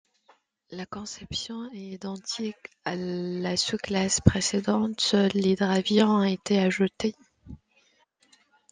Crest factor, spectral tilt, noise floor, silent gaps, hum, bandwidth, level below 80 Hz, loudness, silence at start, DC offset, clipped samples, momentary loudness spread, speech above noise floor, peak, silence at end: 26 dB; -4.5 dB/octave; -66 dBFS; none; none; 9.8 kHz; -52 dBFS; -26 LUFS; 0.7 s; under 0.1%; under 0.1%; 15 LU; 40 dB; -2 dBFS; 1.15 s